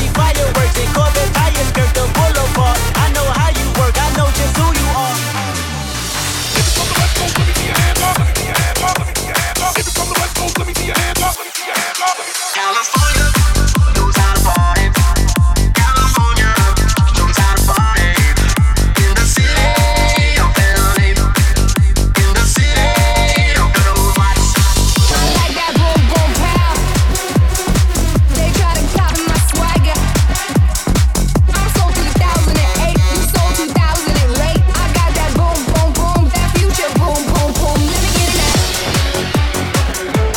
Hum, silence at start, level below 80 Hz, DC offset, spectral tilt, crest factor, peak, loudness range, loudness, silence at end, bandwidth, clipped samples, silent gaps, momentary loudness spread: none; 0 s; -16 dBFS; under 0.1%; -4 dB/octave; 12 dB; 0 dBFS; 3 LU; -13 LUFS; 0 s; 17.5 kHz; under 0.1%; none; 4 LU